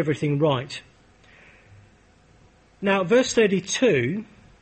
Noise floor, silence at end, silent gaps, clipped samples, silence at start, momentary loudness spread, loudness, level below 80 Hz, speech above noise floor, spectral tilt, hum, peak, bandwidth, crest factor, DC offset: -56 dBFS; 0.4 s; none; under 0.1%; 0 s; 12 LU; -22 LUFS; -58 dBFS; 34 dB; -5 dB/octave; none; -8 dBFS; 8.8 kHz; 16 dB; under 0.1%